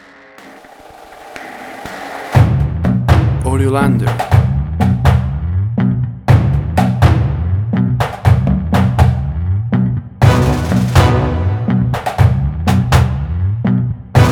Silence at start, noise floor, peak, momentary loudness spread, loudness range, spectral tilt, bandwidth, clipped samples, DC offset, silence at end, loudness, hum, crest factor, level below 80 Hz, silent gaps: 0.4 s; -39 dBFS; 0 dBFS; 7 LU; 2 LU; -7.5 dB/octave; 15.5 kHz; under 0.1%; under 0.1%; 0 s; -14 LUFS; none; 12 dB; -24 dBFS; none